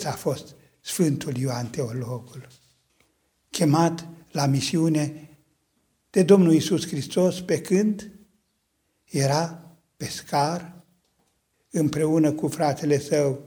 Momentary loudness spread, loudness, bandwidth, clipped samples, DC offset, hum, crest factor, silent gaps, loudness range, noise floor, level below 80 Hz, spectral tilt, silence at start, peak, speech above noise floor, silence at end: 14 LU; -24 LUFS; over 20 kHz; under 0.1%; under 0.1%; none; 20 dB; none; 7 LU; -72 dBFS; -64 dBFS; -6 dB/octave; 0 s; -4 dBFS; 50 dB; 0 s